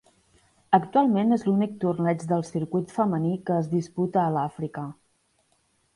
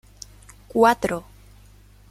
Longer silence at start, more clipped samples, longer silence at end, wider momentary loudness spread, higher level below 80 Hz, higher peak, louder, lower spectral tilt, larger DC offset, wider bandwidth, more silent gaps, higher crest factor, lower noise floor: about the same, 0.7 s vs 0.75 s; neither; first, 1.05 s vs 0.9 s; second, 8 LU vs 24 LU; second, -66 dBFS vs -50 dBFS; about the same, -6 dBFS vs -4 dBFS; second, -25 LUFS vs -21 LUFS; first, -8.5 dB/octave vs -5 dB/octave; neither; second, 11.5 kHz vs 15.5 kHz; neither; about the same, 20 dB vs 20 dB; first, -68 dBFS vs -50 dBFS